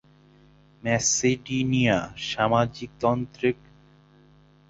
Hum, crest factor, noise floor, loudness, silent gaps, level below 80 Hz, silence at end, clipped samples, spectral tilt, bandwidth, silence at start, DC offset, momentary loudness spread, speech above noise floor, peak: 50 Hz at -55 dBFS; 20 dB; -56 dBFS; -24 LUFS; none; -54 dBFS; 1.15 s; under 0.1%; -4 dB/octave; 8 kHz; 0.85 s; under 0.1%; 8 LU; 31 dB; -6 dBFS